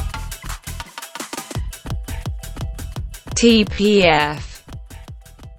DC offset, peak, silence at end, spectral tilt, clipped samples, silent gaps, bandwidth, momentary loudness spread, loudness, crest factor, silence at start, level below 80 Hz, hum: under 0.1%; 0 dBFS; 0 s; -4.5 dB/octave; under 0.1%; none; 17.5 kHz; 24 LU; -19 LUFS; 20 dB; 0 s; -32 dBFS; none